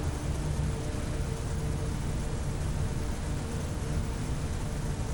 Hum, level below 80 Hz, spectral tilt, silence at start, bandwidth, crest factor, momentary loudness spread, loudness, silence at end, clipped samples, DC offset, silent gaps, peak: none; -36 dBFS; -6 dB/octave; 0 s; 17.5 kHz; 14 dB; 2 LU; -34 LUFS; 0 s; under 0.1%; under 0.1%; none; -18 dBFS